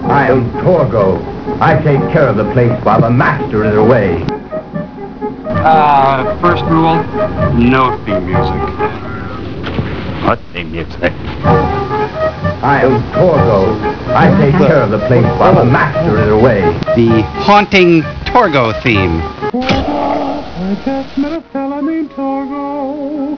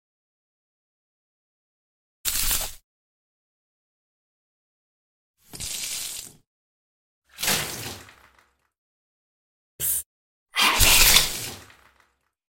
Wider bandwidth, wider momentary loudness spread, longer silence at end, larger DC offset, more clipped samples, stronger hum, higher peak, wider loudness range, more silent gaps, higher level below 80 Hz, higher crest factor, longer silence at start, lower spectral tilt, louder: second, 5.4 kHz vs 17 kHz; second, 11 LU vs 21 LU; second, 0 s vs 0.85 s; neither; first, 0.3% vs under 0.1%; neither; about the same, 0 dBFS vs 0 dBFS; second, 7 LU vs 15 LU; second, none vs 2.84-5.34 s, 6.47-7.22 s, 8.78-9.79 s, 10.06-10.46 s; first, -30 dBFS vs -38 dBFS; second, 12 dB vs 28 dB; second, 0 s vs 2.25 s; first, -8 dB/octave vs 0 dB/octave; first, -12 LUFS vs -21 LUFS